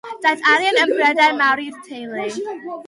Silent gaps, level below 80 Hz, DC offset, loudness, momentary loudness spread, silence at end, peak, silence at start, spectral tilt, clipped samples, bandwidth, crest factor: none; -72 dBFS; under 0.1%; -16 LUFS; 15 LU; 0.05 s; -4 dBFS; 0.05 s; -2 dB/octave; under 0.1%; 11.5 kHz; 14 dB